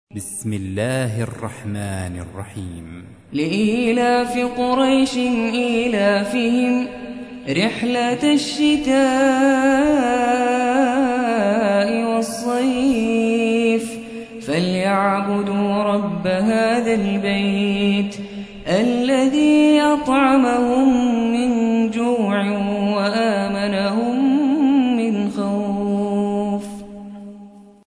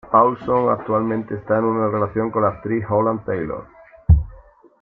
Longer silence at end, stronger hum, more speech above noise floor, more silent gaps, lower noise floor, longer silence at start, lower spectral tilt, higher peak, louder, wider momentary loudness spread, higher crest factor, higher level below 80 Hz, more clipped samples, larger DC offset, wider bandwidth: about the same, 0.4 s vs 0.45 s; neither; about the same, 24 dB vs 26 dB; neither; second, -42 dBFS vs -46 dBFS; about the same, 0.15 s vs 0.05 s; second, -5.5 dB/octave vs -12 dB/octave; about the same, -4 dBFS vs -2 dBFS; about the same, -18 LUFS vs -20 LUFS; first, 13 LU vs 8 LU; about the same, 14 dB vs 18 dB; second, -50 dBFS vs -30 dBFS; neither; neither; first, 11 kHz vs 3.6 kHz